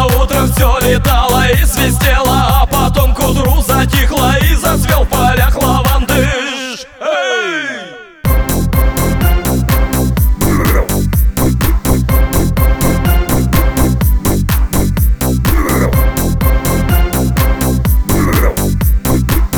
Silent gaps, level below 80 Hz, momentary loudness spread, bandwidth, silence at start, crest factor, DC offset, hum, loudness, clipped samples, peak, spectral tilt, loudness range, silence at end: none; -14 dBFS; 3 LU; over 20 kHz; 0 s; 10 dB; under 0.1%; none; -12 LUFS; under 0.1%; 0 dBFS; -5 dB/octave; 3 LU; 0 s